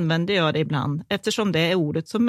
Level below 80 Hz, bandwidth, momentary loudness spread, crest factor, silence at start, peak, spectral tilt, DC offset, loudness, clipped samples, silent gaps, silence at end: -60 dBFS; 14 kHz; 5 LU; 16 dB; 0 s; -6 dBFS; -5.5 dB/octave; under 0.1%; -23 LUFS; under 0.1%; none; 0 s